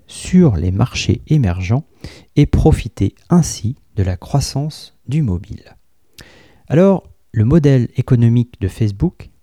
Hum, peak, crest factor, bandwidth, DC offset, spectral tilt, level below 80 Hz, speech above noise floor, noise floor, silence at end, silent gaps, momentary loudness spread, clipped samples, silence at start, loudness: none; 0 dBFS; 14 dB; 13.5 kHz; 0.3%; -7 dB/octave; -30 dBFS; 30 dB; -45 dBFS; 0.2 s; none; 11 LU; under 0.1%; 0.1 s; -16 LUFS